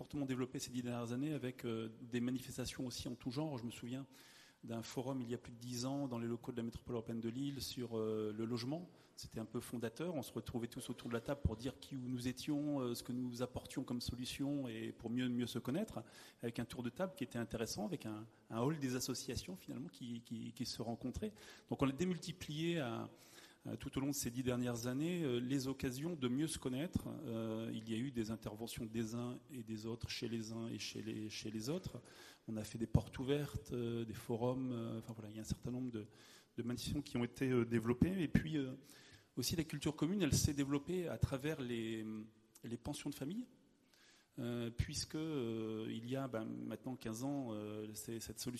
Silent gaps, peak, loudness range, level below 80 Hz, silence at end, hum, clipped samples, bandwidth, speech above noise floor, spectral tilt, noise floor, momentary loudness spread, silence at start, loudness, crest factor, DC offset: none; -18 dBFS; 5 LU; -62 dBFS; 0 s; none; under 0.1%; 13.5 kHz; 28 dB; -5.5 dB/octave; -70 dBFS; 10 LU; 0 s; -43 LUFS; 24 dB; under 0.1%